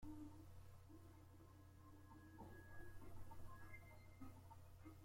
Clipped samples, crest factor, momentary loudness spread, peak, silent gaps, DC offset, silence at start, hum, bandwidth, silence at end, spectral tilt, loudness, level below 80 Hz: under 0.1%; 14 dB; 5 LU; -44 dBFS; none; under 0.1%; 0 s; none; 16.5 kHz; 0 s; -6.5 dB/octave; -63 LUFS; -68 dBFS